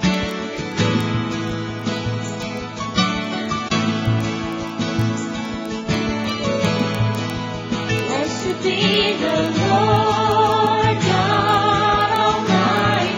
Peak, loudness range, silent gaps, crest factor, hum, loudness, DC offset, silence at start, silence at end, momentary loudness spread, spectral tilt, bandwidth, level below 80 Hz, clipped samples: -2 dBFS; 6 LU; none; 16 dB; none; -19 LUFS; under 0.1%; 0 s; 0 s; 9 LU; -5 dB/octave; 16 kHz; -42 dBFS; under 0.1%